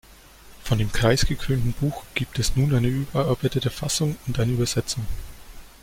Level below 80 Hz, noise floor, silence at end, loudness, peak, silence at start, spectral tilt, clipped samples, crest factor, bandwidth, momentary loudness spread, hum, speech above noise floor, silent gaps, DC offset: -34 dBFS; -48 dBFS; 0.15 s; -24 LUFS; -6 dBFS; 0.45 s; -5 dB/octave; under 0.1%; 18 dB; 16.5 kHz; 8 LU; none; 25 dB; none; under 0.1%